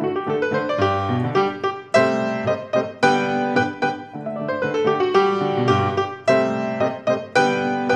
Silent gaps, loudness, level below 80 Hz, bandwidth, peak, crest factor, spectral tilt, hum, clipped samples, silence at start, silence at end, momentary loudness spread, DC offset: none; -20 LUFS; -66 dBFS; 10 kHz; -4 dBFS; 18 dB; -6 dB/octave; none; under 0.1%; 0 s; 0 s; 6 LU; under 0.1%